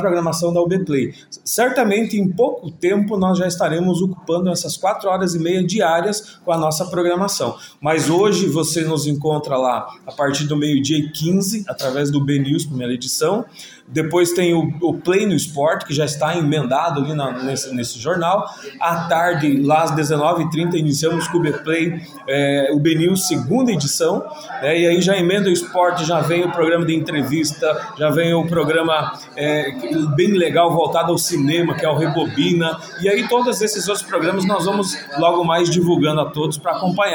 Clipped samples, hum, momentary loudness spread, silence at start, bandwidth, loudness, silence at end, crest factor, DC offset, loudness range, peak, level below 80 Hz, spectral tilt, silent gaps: under 0.1%; none; 6 LU; 0 s; 17.5 kHz; -18 LUFS; 0 s; 14 dB; under 0.1%; 2 LU; -4 dBFS; -58 dBFS; -5 dB/octave; none